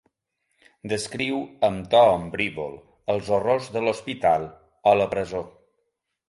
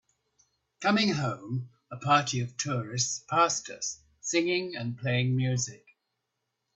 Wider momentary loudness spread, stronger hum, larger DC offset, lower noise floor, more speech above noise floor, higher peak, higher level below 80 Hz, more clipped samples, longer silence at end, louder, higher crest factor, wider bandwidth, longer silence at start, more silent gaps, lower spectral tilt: first, 15 LU vs 10 LU; neither; neither; second, -76 dBFS vs -82 dBFS; about the same, 53 dB vs 54 dB; about the same, -6 dBFS vs -8 dBFS; first, -54 dBFS vs -68 dBFS; neither; second, 0.8 s vs 1 s; first, -23 LUFS vs -29 LUFS; about the same, 20 dB vs 22 dB; first, 11.5 kHz vs 8.4 kHz; about the same, 0.85 s vs 0.8 s; neither; about the same, -5 dB/octave vs -4 dB/octave